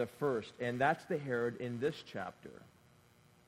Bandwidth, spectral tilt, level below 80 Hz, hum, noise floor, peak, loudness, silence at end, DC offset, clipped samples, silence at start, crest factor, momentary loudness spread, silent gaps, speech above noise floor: 15.5 kHz; -6.5 dB/octave; -74 dBFS; none; -66 dBFS; -16 dBFS; -37 LUFS; 0.8 s; under 0.1%; under 0.1%; 0 s; 22 dB; 13 LU; none; 28 dB